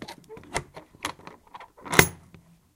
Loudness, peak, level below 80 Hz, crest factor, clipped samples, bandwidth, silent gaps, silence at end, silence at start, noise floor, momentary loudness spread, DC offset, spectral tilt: -25 LUFS; 0 dBFS; -50 dBFS; 30 dB; under 0.1%; 16.5 kHz; none; 0.6 s; 0 s; -55 dBFS; 27 LU; under 0.1%; -3 dB/octave